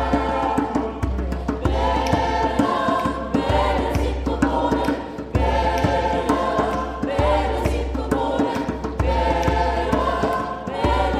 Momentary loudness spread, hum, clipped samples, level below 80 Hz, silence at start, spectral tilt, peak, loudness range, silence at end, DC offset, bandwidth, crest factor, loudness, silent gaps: 5 LU; none; under 0.1%; -28 dBFS; 0 s; -6.5 dB/octave; -4 dBFS; 1 LU; 0 s; under 0.1%; 13.5 kHz; 16 dB; -22 LUFS; none